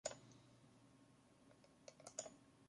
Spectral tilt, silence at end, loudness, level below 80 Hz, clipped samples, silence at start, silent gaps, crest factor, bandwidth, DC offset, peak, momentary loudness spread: -2 dB/octave; 0 s; -56 LUFS; -86 dBFS; under 0.1%; 0.05 s; none; 30 dB; 11.5 kHz; under 0.1%; -30 dBFS; 17 LU